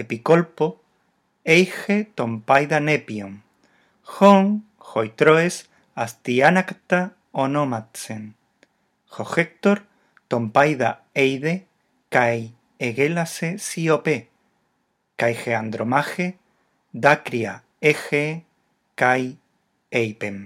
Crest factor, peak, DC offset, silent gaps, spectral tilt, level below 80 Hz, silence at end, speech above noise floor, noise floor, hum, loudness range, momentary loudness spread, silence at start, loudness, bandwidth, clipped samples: 22 dB; 0 dBFS; under 0.1%; none; -5.5 dB/octave; -72 dBFS; 0 s; 51 dB; -71 dBFS; none; 5 LU; 16 LU; 0 s; -21 LUFS; 15.5 kHz; under 0.1%